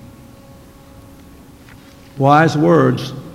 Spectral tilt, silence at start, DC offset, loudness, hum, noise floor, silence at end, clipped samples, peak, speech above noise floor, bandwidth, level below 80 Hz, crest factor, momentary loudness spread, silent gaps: -7 dB/octave; 0.05 s; under 0.1%; -13 LUFS; none; -41 dBFS; 0 s; under 0.1%; 0 dBFS; 28 dB; 15.5 kHz; -48 dBFS; 18 dB; 6 LU; none